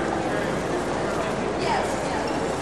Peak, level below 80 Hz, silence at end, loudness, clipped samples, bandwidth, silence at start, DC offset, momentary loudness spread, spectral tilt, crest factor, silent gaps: -12 dBFS; -44 dBFS; 0 s; -25 LUFS; under 0.1%; 13 kHz; 0 s; 0.3%; 2 LU; -5 dB/octave; 14 dB; none